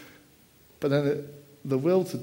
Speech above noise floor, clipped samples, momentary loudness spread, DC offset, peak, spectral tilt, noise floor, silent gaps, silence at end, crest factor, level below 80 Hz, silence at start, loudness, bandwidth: 32 dB; under 0.1%; 15 LU; under 0.1%; -12 dBFS; -7.5 dB/octave; -58 dBFS; none; 0 s; 16 dB; -68 dBFS; 0 s; -27 LUFS; 16.5 kHz